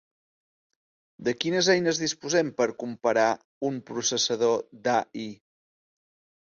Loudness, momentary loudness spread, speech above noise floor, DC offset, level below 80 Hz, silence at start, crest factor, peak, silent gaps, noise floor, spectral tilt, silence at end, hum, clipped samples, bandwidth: -26 LUFS; 10 LU; over 64 dB; under 0.1%; -70 dBFS; 1.2 s; 18 dB; -10 dBFS; 3.45-3.61 s; under -90 dBFS; -3 dB/octave; 1.25 s; none; under 0.1%; 7.8 kHz